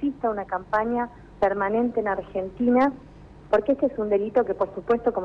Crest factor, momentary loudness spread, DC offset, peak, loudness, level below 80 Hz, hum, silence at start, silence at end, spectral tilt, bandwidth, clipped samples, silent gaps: 12 dB; 7 LU; under 0.1%; -12 dBFS; -25 LUFS; -50 dBFS; none; 0 s; 0 s; -8 dB/octave; 6.4 kHz; under 0.1%; none